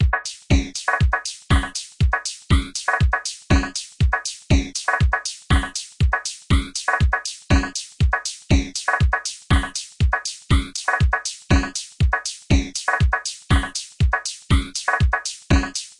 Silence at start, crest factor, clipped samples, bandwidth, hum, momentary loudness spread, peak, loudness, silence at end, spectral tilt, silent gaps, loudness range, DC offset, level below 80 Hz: 0 s; 18 dB; under 0.1%; 11.5 kHz; none; 5 LU; -4 dBFS; -21 LUFS; 0.1 s; -4 dB/octave; none; 0 LU; under 0.1%; -24 dBFS